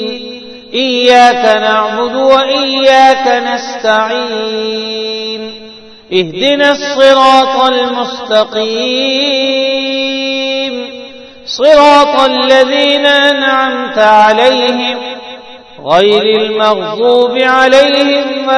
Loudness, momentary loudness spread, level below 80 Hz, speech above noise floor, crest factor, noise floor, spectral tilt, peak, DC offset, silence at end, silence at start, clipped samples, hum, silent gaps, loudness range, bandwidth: -9 LUFS; 14 LU; -50 dBFS; 24 dB; 10 dB; -33 dBFS; -3 dB/octave; 0 dBFS; under 0.1%; 0 s; 0 s; 2%; none; none; 5 LU; 11 kHz